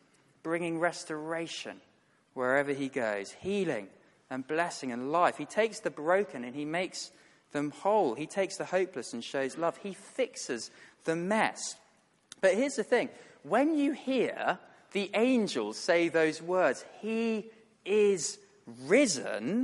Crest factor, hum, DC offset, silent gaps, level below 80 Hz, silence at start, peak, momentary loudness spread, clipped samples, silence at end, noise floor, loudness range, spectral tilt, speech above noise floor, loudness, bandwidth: 20 dB; none; under 0.1%; none; -78 dBFS; 0.45 s; -12 dBFS; 12 LU; under 0.1%; 0 s; -67 dBFS; 4 LU; -4 dB/octave; 36 dB; -31 LUFS; 11.5 kHz